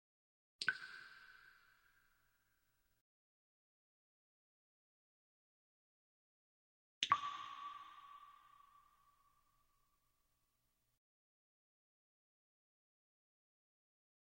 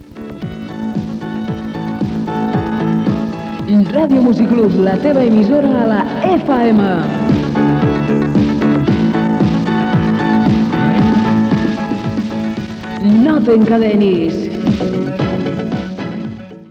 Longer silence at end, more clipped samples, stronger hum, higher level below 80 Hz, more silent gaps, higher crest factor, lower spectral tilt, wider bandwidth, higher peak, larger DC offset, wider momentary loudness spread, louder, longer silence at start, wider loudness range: first, 5.5 s vs 0.05 s; neither; first, 60 Hz at -100 dBFS vs none; second, -90 dBFS vs -38 dBFS; first, 3.01-7.01 s vs none; first, 34 dB vs 10 dB; second, 0 dB/octave vs -8.5 dB/octave; first, 16 kHz vs 7.2 kHz; second, -18 dBFS vs -4 dBFS; neither; first, 24 LU vs 11 LU; second, -43 LUFS vs -14 LUFS; first, 0.6 s vs 0 s; first, 17 LU vs 4 LU